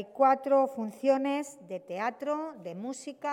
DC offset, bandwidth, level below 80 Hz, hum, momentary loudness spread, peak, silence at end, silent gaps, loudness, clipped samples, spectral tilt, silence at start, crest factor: under 0.1%; 14 kHz; -86 dBFS; none; 14 LU; -12 dBFS; 0 s; none; -30 LUFS; under 0.1%; -5 dB/octave; 0 s; 18 dB